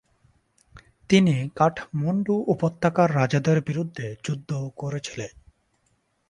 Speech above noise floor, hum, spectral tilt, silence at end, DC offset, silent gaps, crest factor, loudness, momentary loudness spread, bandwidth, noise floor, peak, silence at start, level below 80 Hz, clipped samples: 46 dB; none; -6.5 dB/octave; 1 s; under 0.1%; none; 20 dB; -24 LUFS; 12 LU; 10.5 kHz; -69 dBFS; -4 dBFS; 0.75 s; -58 dBFS; under 0.1%